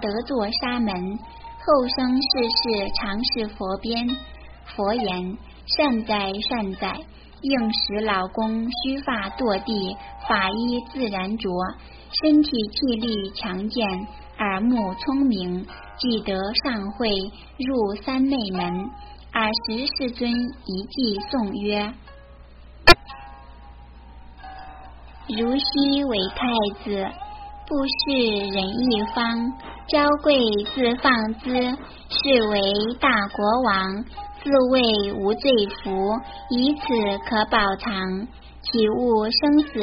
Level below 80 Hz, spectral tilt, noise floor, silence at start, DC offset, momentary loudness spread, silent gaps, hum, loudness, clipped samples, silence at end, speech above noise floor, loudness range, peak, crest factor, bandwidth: -42 dBFS; -2.5 dB/octave; -45 dBFS; 0 s; under 0.1%; 13 LU; none; none; -22 LUFS; under 0.1%; 0 s; 22 dB; 4 LU; 0 dBFS; 24 dB; 5.6 kHz